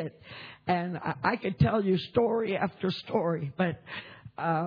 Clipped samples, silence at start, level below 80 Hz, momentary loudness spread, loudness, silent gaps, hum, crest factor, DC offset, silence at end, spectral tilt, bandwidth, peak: under 0.1%; 0 s; -56 dBFS; 14 LU; -29 LUFS; none; none; 18 dB; under 0.1%; 0 s; -9 dB/octave; 5.2 kHz; -12 dBFS